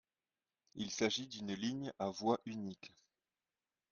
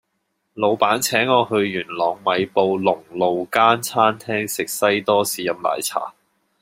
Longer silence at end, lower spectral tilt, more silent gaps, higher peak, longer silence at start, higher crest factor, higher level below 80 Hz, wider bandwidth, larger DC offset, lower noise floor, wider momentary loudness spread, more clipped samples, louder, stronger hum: first, 1.05 s vs 0.5 s; about the same, -4 dB/octave vs -3.5 dB/octave; neither; second, -20 dBFS vs 0 dBFS; first, 0.75 s vs 0.55 s; about the same, 24 dB vs 20 dB; second, -78 dBFS vs -66 dBFS; second, 7.4 kHz vs 16 kHz; neither; first, under -90 dBFS vs -72 dBFS; first, 16 LU vs 7 LU; neither; second, -40 LUFS vs -19 LUFS; neither